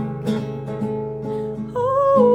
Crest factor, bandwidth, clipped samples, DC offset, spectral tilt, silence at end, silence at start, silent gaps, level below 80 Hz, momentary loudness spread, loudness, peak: 16 dB; 11.5 kHz; under 0.1%; under 0.1%; -8.5 dB/octave; 0 s; 0 s; none; -50 dBFS; 10 LU; -22 LUFS; -4 dBFS